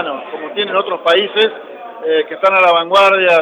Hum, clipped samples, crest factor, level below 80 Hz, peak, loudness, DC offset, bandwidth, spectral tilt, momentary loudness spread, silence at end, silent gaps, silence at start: none; under 0.1%; 12 dB; -64 dBFS; -2 dBFS; -13 LUFS; under 0.1%; 12 kHz; -3.5 dB/octave; 15 LU; 0 s; none; 0 s